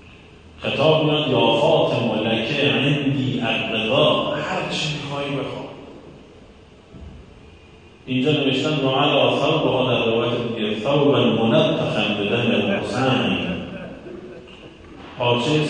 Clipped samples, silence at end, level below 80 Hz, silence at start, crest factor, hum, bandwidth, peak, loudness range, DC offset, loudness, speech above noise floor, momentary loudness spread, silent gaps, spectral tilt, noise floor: under 0.1%; 0 s; -50 dBFS; 0.05 s; 16 dB; none; 9.6 kHz; -4 dBFS; 9 LU; under 0.1%; -20 LUFS; 27 dB; 14 LU; none; -6 dB/octave; -46 dBFS